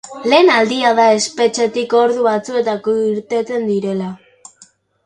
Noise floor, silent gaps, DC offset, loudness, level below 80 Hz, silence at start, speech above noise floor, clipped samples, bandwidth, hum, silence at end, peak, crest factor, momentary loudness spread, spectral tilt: -49 dBFS; none; under 0.1%; -15 LUFS; -64 dBFS; 0.05 s; 35 dB; under 0.1%; 11 kHz; none; 0.9 s; 0 dBFS; 16 dB; 8 LU; -4 dB/octave